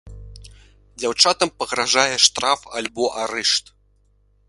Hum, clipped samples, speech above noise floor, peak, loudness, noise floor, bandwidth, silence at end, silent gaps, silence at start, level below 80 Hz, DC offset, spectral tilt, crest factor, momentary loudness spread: 50 Hz at -55 dBFS; under 0.1%; 39 dB; 0 dBFS; -18 LUFS; -59 dBFS; 11.5 kHz; 0.9 s; none; 0.05 s; -48 dBFS; under 0.1%; -0.5 dB/octave; 22 dB; 9 LU